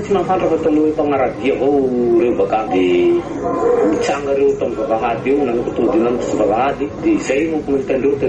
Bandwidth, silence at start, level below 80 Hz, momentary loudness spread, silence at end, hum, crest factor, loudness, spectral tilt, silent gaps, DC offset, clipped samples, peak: 8.8 kHz; 0 s; -42 dBFS; 4 LU; 0 s; none; 12 dB; -16 LUFS; -6.5 dB/octave; none; under 0.1%; under 0.1%; -4 dBFS